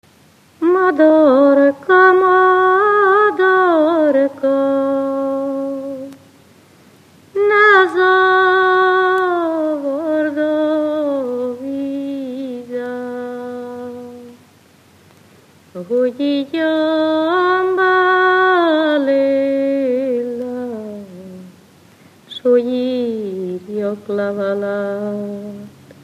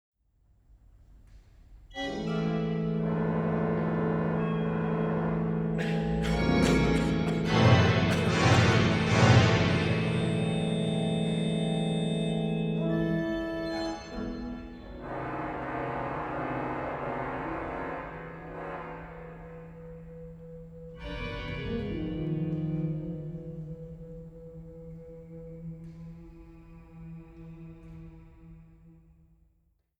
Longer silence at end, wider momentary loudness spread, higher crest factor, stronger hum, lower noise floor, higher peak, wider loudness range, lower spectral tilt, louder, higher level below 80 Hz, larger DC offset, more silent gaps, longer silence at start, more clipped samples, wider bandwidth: second, 0.1 s vs 1.1 s; second, 16 LU vs 22 LU; second, 16 dB vs 22 dB; neither; second, -50 dBFS vs -71 dBFS; first, 0 dBFS vs -8 dBFS; second, 12 LU vs 22 LU; about the same, -6 dB/octave vs -6.5 dB/octave; first, -15 LUFS vs -29 LUFS; second, -70 dBFS vs -46 dBFS; neither; neither; second, 0.6 s vs 1.15 s; neither; about the same, 9.8 kHz vs 10.5 kHz